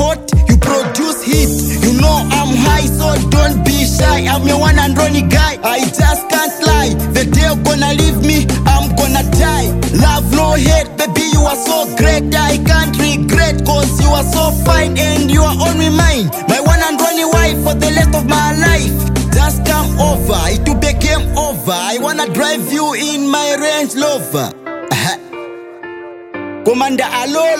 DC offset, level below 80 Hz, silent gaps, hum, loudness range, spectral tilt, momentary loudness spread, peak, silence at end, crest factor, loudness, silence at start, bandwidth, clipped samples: under 0.1%; -18 dBFS; none; none; 3 LU; -4.5 dB/octave; 5 LU; 0 dBFS; 0 s; 12 dB; -12 LUFS; 0 s; 16.5 kHz; under 0.1%